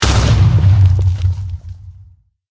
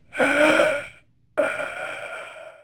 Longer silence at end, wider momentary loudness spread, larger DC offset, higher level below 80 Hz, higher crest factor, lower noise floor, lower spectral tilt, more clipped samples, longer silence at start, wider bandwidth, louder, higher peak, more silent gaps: first, 0.6 s vs 0.1 s; about the same, 17 LU vs 19 LU; neither; first, -20 dBFS vs -60 dBFS; second, 12 dB vs 18 dB; second, -45 dBFS vs -51 dBFS; first, -5.5 dB/octave vs -3.5 dB/octave; neither; second, 0 s vs 0.15 s; second, 8 kHz vs 19 kHz; first, -13 LUFS vs -22 LUFS; first, 0 dBFS vs -4 dBFS; neither